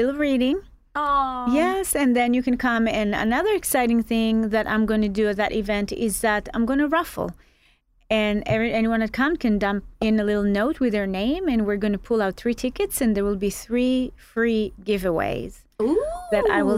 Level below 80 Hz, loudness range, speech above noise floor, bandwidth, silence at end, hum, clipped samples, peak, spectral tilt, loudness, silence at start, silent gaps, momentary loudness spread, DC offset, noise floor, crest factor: -42 dBFS; 3 LU; 38 dB; 16 kHz; 0 s; none; under 0.1%; -6 dBFS; -5 dB/octave; -23 LUFS; 0 s; none; 5 LU; under 0.1%; -60 dBFS; 16 dB